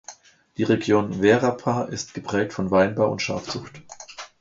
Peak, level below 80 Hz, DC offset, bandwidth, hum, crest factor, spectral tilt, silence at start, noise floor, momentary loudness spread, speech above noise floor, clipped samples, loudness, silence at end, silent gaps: -4 dBFS; -54 dBFS; under 0.1%; 7.8 kHz; none; 20 dB; -5.5 dB/octave; 0.1 s; -47 dBFS; 20 LU; 24 dB; under 0.1%; -23 LUFS; 0.15 s; none